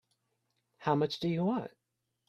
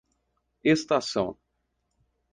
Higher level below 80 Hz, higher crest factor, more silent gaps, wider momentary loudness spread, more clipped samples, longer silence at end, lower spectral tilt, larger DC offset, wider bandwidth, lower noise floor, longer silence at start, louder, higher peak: second, -72 dBFS vs -64 dBFS; about the same, 22 dB vs 20 dB; neither; about the same, 8 LU vs 7 LU; neither; second, 0.6 s vs 1 s; first, -7.5 dB/octave vs -5 dB/octave; neither; about the same, 10.5 kHz vs 9.6 kHz; first, -84 dBFS vs -77 dBFS; first, 0.8 s vs 0.65 s; second, -33 LUFS vs -26 LUFS; second, -14 dBFS vs -10 dBFS